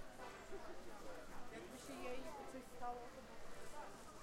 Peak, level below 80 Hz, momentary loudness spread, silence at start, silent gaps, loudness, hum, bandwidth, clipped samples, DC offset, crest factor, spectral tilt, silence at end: -34 dBFS; -62 dBFS; 6 LU; 0 s; none; -54 LUFS; none; 16 kHz; under 0.1%; under 0.1%; 16 dB; -4 dB/octave; 0 s